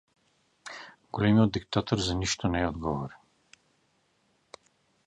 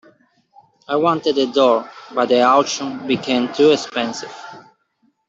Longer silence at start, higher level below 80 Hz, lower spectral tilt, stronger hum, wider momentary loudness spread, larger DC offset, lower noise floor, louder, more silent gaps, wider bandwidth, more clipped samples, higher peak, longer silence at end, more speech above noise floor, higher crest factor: second, 0.65 s vs 0.9 s; first, -48 dBFS vs -66 dBFS; first, -5.5 dB/octave vs -4 dB/octave; neither; first, 20 LU vs 13 LU; neither; first, -71 dBFS vs -64 dBFS; second, -28 LUFS vs -17 LUFS; neither; first, 10.5 kHz vs 8 kHz; neither; second, -10 dBFS vs -2 dBFS; first, 1.9 s vs 0.7 s; about the same, 44 dB vs 47 dB; about the same, 20 dB vs 16 dB